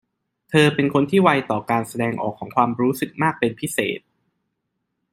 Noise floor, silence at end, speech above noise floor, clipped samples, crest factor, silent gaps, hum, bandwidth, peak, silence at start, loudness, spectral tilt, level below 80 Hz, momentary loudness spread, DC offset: -76 dBFS; 1.15 s; 56 dB; under 0.1%; 20 dB; none; none; 16 kHz; -2 dBFS; 0.5 s; -20 LUFS; -5.5 dB/octave; -60 dBFS; 8 LU; under 0.1%